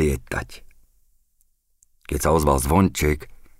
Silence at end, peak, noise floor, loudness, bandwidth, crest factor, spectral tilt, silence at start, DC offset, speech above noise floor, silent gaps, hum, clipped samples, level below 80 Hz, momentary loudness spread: 0.25 s; -4 dBFS; -64 dBFS; -22 LUFS; 16 kHz; 18 dB; -5.5 dB/octave; 0 s; under 0.1%; 43 dB; none; none; under 0.1%; -32 dBFS; 13 LU